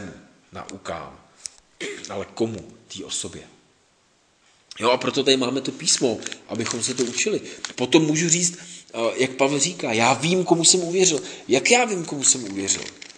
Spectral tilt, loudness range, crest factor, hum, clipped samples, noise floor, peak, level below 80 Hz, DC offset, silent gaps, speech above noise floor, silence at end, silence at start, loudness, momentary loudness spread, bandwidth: -2.5 dB/octave; 13 LU; 22 dB; none; under 0.1%; -62 dBFS; 0 dBFS; -64 dBFS; under 0.1%; none; 39 dB; 0.1 s; 0 s; -21 LUFS; 21 LU; 10.5 kHz